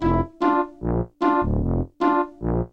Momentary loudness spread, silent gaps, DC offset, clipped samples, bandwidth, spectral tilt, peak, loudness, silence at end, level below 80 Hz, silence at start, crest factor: 5 LU; none; 0.3%; under 0.1%; 7.2 kHz; -9.5 dB/octave; -6 dBFS; -23 LUFS; 0.05 s; -32 dBFS; 0 s; 16 dB